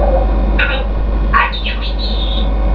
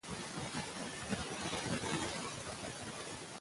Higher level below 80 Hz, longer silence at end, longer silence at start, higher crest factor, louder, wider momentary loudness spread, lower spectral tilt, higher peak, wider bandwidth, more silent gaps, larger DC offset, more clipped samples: first, -14 dBFS vs -60 dBFS; about the same, 0 s vs 0 s; about the same, 0 s vs 0.05 s; second, 14 dB vs 20 dB; first, -16 LUFS vs -41 LUFS; about the same, 6 LU vs 6 LU; first, -8 dB/octave vs -3.5 dB/octave; first, 0 dBFS vs -22 dBFS; second, 5.4 kHz vs 11.5 kHz; neither; first, 0.5% vs under 0.1%; neither